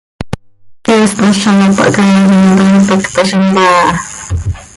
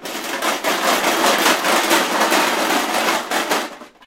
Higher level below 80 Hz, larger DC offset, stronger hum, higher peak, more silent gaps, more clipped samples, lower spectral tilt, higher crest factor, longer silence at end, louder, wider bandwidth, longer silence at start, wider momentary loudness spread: first, -30 dBFS vs -62 dBFS; neither; neither; about the same, 0 dBFS vs 0 dBFS; neither; neither; first, -5.5 dB/octave vs -1 dB/octave; second, 10 dB vs 18 dB; about the same, 0.1 s vs 0.2 s; first, -9 LUFS vs -17 LUFS; second, 11.5 kHz vs 17 kHz; first, 0.2 s vs 0 s; first, 13 LU vs 7 LU